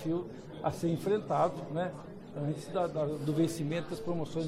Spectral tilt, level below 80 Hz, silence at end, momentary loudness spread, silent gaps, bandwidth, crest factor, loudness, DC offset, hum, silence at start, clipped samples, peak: -7 dB/octave; -62 dBFS; 0 s; 8 LU; none; 15.5 kHz; 16 dB; -34 LUFS; under 0.1%; none; 0 s; under 0.1%; -18 dBFS